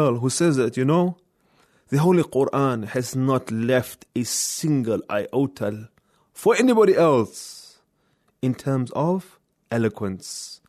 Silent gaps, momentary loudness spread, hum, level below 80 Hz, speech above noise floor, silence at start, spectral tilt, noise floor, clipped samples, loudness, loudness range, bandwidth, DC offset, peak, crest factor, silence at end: none; 13 LU; none; -64 dBFS; 45 dB; 0 s; -5.5 dB/octave; -67 dBFS; under 0.1%; -22 LUFS; 3 LU; 14 kHz; under 0.1%; -6 dBFS; 16 dB; 0.15 s